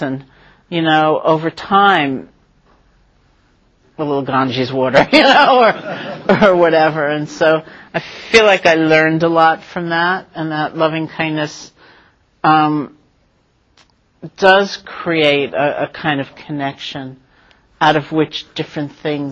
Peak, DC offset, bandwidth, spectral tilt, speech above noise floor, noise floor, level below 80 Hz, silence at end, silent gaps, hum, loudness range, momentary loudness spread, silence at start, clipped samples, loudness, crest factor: 0 dBFS; under 0.1%; 8.8 kHz; -5.5 dB/octave; 44 dB; -58 dBFS; -54 dBFS; 0 s; none; none; 7 LU; 14 LU; 0 s; under 0.1%; -14 LUFS; 16 dB